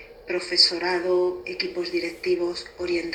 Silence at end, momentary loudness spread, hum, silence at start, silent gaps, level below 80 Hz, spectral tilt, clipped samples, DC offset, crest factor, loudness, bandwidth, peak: 0 s; 12 LU; none; 0 s; none; -58 dBFS; -3 dB/octave; under 0.1%; under 0.1%; 20 dB; -24 LUFS; 9.4 kHz; -4 dBFS